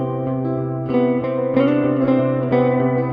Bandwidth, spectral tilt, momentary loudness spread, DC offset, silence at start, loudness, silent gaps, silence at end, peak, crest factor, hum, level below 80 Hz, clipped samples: 5.2 kHz; -11 dB/octave; 6 LU; under 0.1%; 0 s; -19 LUFS; none; 0 s; -2 dBFS; 16 dB; none; -52 dBFS; under 0.1%